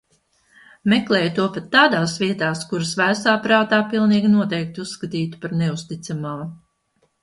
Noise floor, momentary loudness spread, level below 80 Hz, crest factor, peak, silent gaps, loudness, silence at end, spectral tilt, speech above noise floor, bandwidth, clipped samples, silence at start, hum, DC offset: -66 dBFS; 13 LU; -60 dBFS; 18 dB; -2 dBFS; none; -20 LUFS; 0.65 s; -5 dB/octave; 47 dB; 11.5 kHz; under 0.1%; 0.85 s; none; under 0.1%